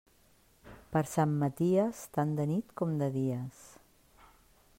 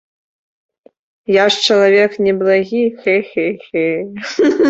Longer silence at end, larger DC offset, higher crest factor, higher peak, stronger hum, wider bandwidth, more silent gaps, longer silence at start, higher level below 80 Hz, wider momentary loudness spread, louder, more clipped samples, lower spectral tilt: first, 1.1 s vs 0 s; neither; about the same, 18 dB vs 14 dB; second, -16 dBFS vs -2 dBFS; neither; first, 16 kHz vs 8 kHz; neither; second, 0.65 s vs 1.3 s; second, -66 dBFS vs -60 dBFS; second, 6 LU vs 9 LU; second, -32 LUFS vs -14 LUFS; neither; first, -7.5 dB/octave vs -4.5 dB/octave